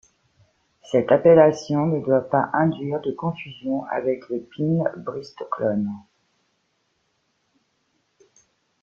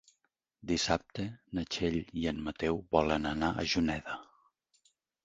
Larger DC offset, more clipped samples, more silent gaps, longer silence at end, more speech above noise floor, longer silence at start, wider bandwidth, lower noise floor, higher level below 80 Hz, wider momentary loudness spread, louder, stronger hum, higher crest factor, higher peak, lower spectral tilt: neither; neither; neither; first, 2.85 s vs 1 s; about the same, 49 dB vs 47 dB; first, 0.9 s vs 0.65 s; about the same, 7.4 kHz vs 8 kHz; second, -70 dBFS vs -80 dBFS; second, -64 dBFS vs -52 dBFS; first, 17 LU vs 10 LU; first, -22 LUFS vs -33 LUFS; neither; about the same, 22 dB vs 24 dB; first, -2 dBFS vs -10 dBFS; first, -8 dB/octave vs -4.5 dB/octave